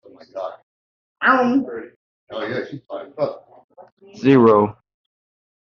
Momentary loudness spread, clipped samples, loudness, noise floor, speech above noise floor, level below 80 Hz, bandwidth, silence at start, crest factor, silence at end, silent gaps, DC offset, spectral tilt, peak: 20 LU; under 0.1%; -18 LUFS; under -90 dBFS; over 72 dB; -64 dBFS; 6.8 kHz; 0.35 s; 20 dB; 0.95 s; 0.63-1.15 s, 1.96-2.27 s, 3.64-3.69 s, 3.92-3.97 s; under 0.1%; -5.5 dB/octave; -2 dBFS